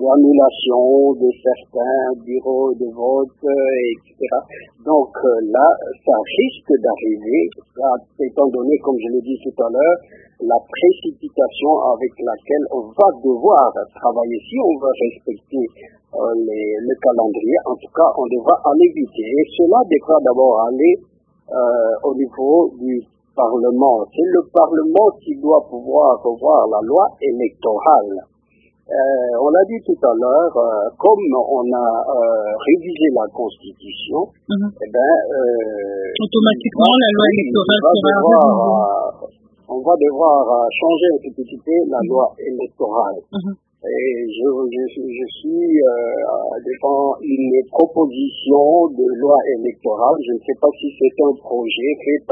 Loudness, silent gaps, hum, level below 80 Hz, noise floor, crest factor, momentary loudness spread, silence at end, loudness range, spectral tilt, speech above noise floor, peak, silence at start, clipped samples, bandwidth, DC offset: -16 LUFS; none; none; -60 dBFS; -57 dBFS; 16 dB; 10 LU; 0 s; 5 LU; -8.5 dB/octave; 42 dB; 0 dBFS; 0 s; under 0.1%; 3.9 kHz; under 0.1%